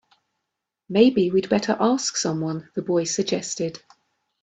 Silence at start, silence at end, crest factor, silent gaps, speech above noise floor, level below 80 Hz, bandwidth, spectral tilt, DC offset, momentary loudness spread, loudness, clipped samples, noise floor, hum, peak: 0.9 s; 0.65 s; 20 dB; none; 60 dB; -64 dBFS; 9.2 kHz; -4.5 dB/octave; under 0.1%; 10 LU; -22 LUFS; under 0.1%; -82 dBFS; none; -4 dBFS